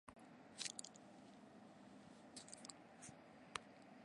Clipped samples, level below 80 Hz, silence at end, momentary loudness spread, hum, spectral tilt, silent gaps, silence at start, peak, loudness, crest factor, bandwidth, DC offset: under 0.1%; -86 dBFS; 0 s; 14 LU; none; -2 dB/octave; none; 0.05 s; -22 dBFS; -56 LUFS; 36 dB; 11.5 kHz; under 0.1%